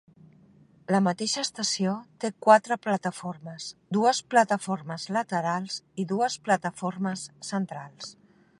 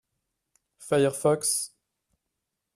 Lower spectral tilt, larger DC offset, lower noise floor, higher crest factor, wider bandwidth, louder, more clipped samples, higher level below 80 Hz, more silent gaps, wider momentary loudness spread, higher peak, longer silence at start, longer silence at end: about the same, -4 dB/octave vs -4 dB/octave; neither; second, -57 dBFS vs -83 dBFS; about the same, 22 dB vs 20 dB; second, 11.5 kHz vs 15 kHz; about the same, -27 LUFS vs -25 LUFS; neither; second, -76 dBFS vs -70 dBFS; neither; about the same, 16 LU vs 14 LU; first, -6 dBFS vs -10 dBFS; about the same, 0.9 s vs 0.8 s; second, 0.5 s vs 1.1 s